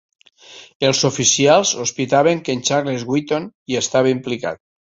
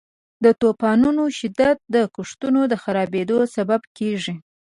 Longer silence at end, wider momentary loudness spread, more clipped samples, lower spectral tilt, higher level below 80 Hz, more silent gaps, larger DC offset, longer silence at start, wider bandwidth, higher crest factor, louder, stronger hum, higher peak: about the same, 0.35 s vs 0.3 s; about the same, 10 LU vs 9 LU; neither; second, -3.5 dB/octave vs -6 dB/octave; about the same, -58 dBFS vs -58 dBFS; first, 0.75-0.80 s, 3.55-3.66 s vs 3.87-3.95 s; neither; about the same, 0.5 s vs 0.4 s; second, 8 kHz vs 11.5 kHz; about the same, 18 dB vs 16 dB; first, -17 LUFS vs -20 LUFS; neither; about the same, -2 dBFS vs -4 dBFS